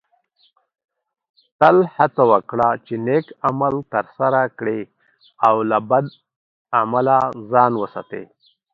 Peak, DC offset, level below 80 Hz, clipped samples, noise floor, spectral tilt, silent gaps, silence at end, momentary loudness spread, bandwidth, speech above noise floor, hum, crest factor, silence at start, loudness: 0 dBFS; under 0.1%; -62 dBFS; under 0.1%; -62 dBFS; -9 dB/octave; 6.36-6.65 s; 0.5 s; 12 LU; 6.8 kHz; 44 dB; none; 20 dB; 1.6 s; -18 LUFS